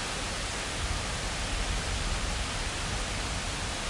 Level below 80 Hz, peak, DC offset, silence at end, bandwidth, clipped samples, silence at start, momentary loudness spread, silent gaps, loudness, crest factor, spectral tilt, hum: -36 dBFS; -18 dBFS; under 0.1%; 0 s; 11.5 kHz; under 0.1%; 0 s; 1 LU; none; -32 LUFS; 14 dB; -2.5 dB/octave; none